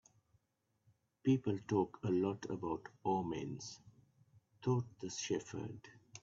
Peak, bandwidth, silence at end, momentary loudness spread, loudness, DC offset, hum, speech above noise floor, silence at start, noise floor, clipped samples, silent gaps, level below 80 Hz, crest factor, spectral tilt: -20 dBFS; 7.8 kHz; 0.05 s; 13 LU; -39 LUFS; under 0.1%; none; 44 dB; 1.25 s; -83 dBFS; under 0.1%; none; -74 dBFS; 20 dB; -7 dB/octave